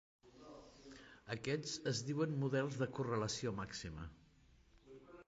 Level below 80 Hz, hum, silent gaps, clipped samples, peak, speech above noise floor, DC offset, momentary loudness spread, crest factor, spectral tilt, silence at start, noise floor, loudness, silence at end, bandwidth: -66 dBFS; none; none; under 0.1%; -26 dBFS; 28 dB; under 0.1%; 20 LU; 18 dB; -5 dB/octave; 0.25 s; -68 dBFS; -41 LUFS; 0.05 s; 9 kHz